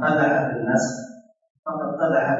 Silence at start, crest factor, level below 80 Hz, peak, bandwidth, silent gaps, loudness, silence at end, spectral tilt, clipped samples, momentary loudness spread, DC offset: 0 s; 16 dB; -66 dBFS; -6 dBFS; 8 kHz; 1.50-1.63 s; -22 LUFS; 0 s; -6 dB/octave; under 0.1%; 16 LU; under 0.1%